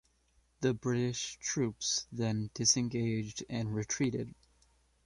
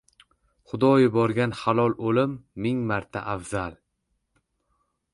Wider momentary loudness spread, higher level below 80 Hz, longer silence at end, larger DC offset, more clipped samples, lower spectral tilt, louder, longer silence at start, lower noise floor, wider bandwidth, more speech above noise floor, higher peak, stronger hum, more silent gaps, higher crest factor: second, 9 LU vs 12 LU; second, -64 dBFS vs -56 dBFS; second, 0.7 s vs 1.4 s; neither; neither; second, -4 dB/octave vs -7 dB/octave; second, -33 LUFS vs -24 LUFS; second, 0.6 s vs 0.75 s; second, -71 dBFS vs -76 dBFS; about the same, 11.5 kHz vs 11.5 kHz; second, 38 dB vs 52 dB; second, -14 dBFS vs -6 dBFS; neither; neither; about the same, 20 dB vs 18 dB